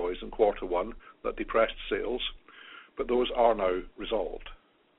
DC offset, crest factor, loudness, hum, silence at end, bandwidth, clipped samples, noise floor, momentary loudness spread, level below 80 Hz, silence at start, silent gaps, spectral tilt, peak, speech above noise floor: under 0.1%; 22 dB; -30 LUFS; none; 0.4 s; 4 kHz; under 0.1%; -51 dBFS; 19 LU; -46 dBFS; 0 s; none; -2 dB/octave; -8 dBFS; 22 dB